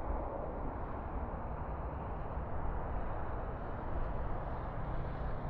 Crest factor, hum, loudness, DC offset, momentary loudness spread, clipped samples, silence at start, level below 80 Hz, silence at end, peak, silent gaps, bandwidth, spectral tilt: 12 dB; none; -42 LUFS; under 0.1%; 2 LU; under 0.1%; 0 s; -42 dBFS; 0 s; -24 dBFS; none; 4.4 kHz; -8 dB/octave